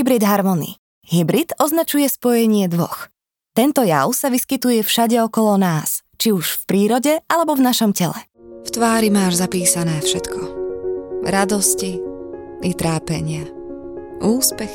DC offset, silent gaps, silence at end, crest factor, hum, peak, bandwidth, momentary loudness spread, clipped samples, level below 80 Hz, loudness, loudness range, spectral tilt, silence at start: under 0.1%; 0.78-1.02 s; 0 s; 18 dB; none; 0 dBFS; 19.5 kHz; 12 LU; under 0.1%; -52 dBFS; -18 LUFS; 4 LU; -4.5 dB/octave; 0 s